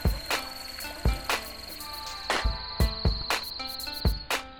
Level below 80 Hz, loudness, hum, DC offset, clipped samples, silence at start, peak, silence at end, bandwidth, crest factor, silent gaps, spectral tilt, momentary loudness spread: -34 dBFS; -30 LUFS; none; 0.2%; under 0.1%; 0 s; -12 dBFS; 0 s; 19.5 kHz; 18 dB; none; -4 dB/octave; 9 LU